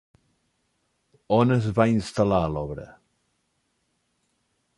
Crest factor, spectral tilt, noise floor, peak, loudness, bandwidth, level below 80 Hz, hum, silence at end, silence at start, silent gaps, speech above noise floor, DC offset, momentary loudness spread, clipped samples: 20 dB; -7.5 dB/octave; -73 dBFS; -6 dBFS; -23 LUFS; 11.5 kHz; -48 dBFS; none; 1.85 s; 1.3 s; none; 51 dB; under 0.1%; 12 LU; under 0.1%